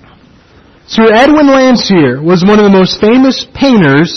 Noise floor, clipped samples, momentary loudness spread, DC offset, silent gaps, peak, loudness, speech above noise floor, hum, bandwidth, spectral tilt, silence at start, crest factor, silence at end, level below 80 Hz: -41 dBFS; 0.2%; 4 LU; under 0.1%; none; 0 dBFS; -6 LUFS; 35 dB; none; 6.4 kHz; -6 dB/octave; 0.9 s; 6 dB; 0 s; -38 dBFS